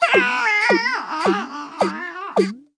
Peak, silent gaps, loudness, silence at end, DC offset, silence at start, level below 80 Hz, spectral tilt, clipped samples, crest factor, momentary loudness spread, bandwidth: -4 dBFS; none; -19 LUFS; 0.15 s; under 0.1%; 0 s; -74 dBFS; -4.5 dB/octave; under 0.1%; 18 dB; 8 LU; 10.5 kHz